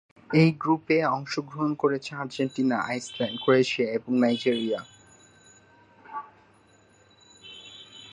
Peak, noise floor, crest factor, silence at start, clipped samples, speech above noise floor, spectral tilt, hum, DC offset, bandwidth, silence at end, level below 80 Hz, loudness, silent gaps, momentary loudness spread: -8 dBFS; -59 dBFS; 20 dB; 0.3 s; under 0.1%; 34 dB; -6 dB/octave; none; under 0.1%; 11 kHz; 0 s; -70 dBFS; -26 LUFS; none; 19 LU